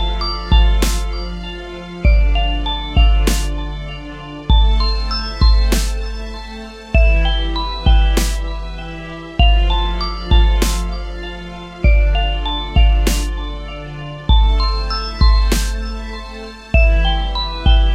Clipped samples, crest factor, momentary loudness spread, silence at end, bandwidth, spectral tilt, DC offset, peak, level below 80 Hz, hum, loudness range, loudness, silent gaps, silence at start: under 0.1%; 14 dB; 15 LU; 0 s; 15 kHz; -5 dB/octave; under 0.1%; 0 dBFS; -16 dBFS; none; 2 LU; -17 LUFS; none; 0 s